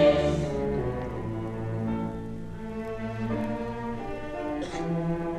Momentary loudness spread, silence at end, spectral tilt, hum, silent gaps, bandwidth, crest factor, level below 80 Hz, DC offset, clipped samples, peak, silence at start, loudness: 8 LU; 0 s; -7.5 dB/octave; none; none; 12 kHz; 20 dB; -44 dBFS; under 0.1%; under 0.1%; -10 dBFS; 0 s; -31 LUFS